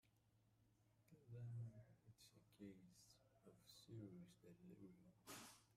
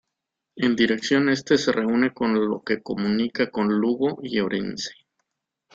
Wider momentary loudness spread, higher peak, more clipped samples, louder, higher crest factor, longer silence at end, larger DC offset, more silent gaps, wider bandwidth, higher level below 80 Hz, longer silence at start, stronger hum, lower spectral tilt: first, 12 LU vs 7 LU; second, -46 dBFS vs -6 dBFS; neither; second, -62 LUFS vs -23 LUFS; about the same, 16 dB vs 18 dB; second, 0 s vs 0.8 s; neither; neither; first, 15.5 kHz vs 7.8 kHz; second, -88 dBFS vs -62 dBFS; second, 0.05 s vs 0.55 s; neither; about the same, -5.5 dB/octave vs -5 dB/octave